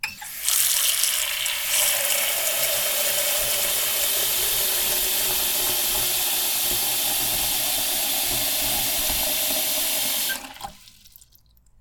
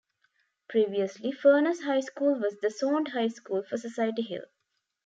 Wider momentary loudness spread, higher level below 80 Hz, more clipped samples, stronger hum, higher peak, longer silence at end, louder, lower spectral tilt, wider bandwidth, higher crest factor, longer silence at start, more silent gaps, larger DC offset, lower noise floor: second, 3 LU vs 11 LU; first, -48 dBFS vs -84 dBFS; neither; neither; first, 0 dBFS vs -10 dBFS; about the same, 0.7 s vs 0.6 s; first, -20 LUFS vs -28 LUFS; second, 1 dB/octave vs -5 dB/octave; first, 19.5 kHz vs 7.8 kHz; about the same, 22 dB vs 18 dB; second, 0.05 s vs 0.7 s; neither; neither; second, -56 dBFS vs -80 dBFS